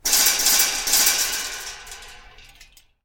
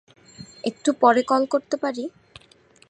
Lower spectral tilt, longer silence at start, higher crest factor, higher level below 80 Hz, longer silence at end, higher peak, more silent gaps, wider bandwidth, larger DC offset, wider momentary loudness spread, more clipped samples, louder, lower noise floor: second, 2.5 dB/octave vs -4 dB/octave; second, 0.05 s vs 0.4 s; about the same, 20 dB vs 20 dB; first, -48 dBFS vs -68 dBFS; second, 0.4 s vs 0.8 s; about the same, -4 dBFS vs -4 dBFS; neither; first, 17.5 kHz vs 9.8 kHz; neither; first, 22 LU vs 16 LU; neither; first, -17 LUFS vs -22 LUFS; second, -51 dBFS vs -55 dBFS